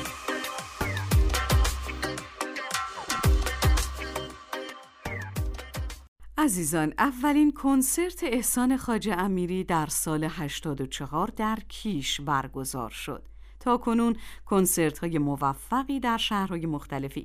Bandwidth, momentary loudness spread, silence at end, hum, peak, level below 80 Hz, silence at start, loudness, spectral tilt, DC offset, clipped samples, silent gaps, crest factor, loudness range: 16 kHz; 12 LU; 0 s; none; -10 dBFS; -36 dBFS; 0 s; -28 LUFS; -4.5 dB/octave; under 0.1%; under 0.1%; 6.08-6.16 s; 18 dB; 5 LU